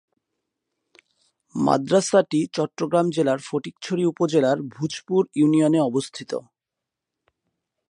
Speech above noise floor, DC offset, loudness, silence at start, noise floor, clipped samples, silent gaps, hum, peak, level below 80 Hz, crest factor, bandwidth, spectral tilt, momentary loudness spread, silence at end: 65 dB; under 0.1%; -22 LUFS; 1.55 s; -86 dBFS; under 0.1%; none; none; -4 dBFS; -70 dBFS; 20 dB; 11 kHz; -6 dB/octave; 11 LU; 1.5 s